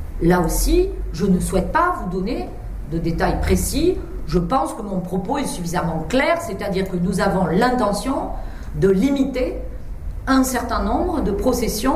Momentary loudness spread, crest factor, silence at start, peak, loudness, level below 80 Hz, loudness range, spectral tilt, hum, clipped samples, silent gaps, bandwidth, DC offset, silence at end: 10 LU; 16 dB; 0 s; -4 dBFS; -20 LUFS; -28 dBFS; 2 LU; -5.5 dB/octave; none; under 0.1%; none; 16 kHz; under 0.1%; 0 s